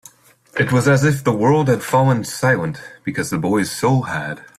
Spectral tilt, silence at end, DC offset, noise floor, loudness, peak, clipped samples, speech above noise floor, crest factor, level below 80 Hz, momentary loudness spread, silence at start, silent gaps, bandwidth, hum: -6 dB/octave; 0.15 s; under 0.1%; -49 dBFS; -18 LUFS; -2 dBFS; under 0.1%; 32 dB; 16 dB; -52 dBFS; 10 LU; 0.55 s; none; 15 kHz; none